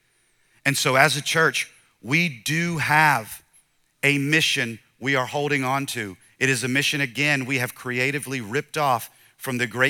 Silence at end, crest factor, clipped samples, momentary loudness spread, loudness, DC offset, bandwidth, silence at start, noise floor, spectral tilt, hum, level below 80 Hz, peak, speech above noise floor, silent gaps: 0 s; 24 dB; under 0.1%; 12 LU; -22 LUFS; under 0.1%; 18.5 kHz; 0.65 s; -64 dBFS; -3.5 dB/octave; none; -66 dBFS; 0 dBFS; 42 dB; none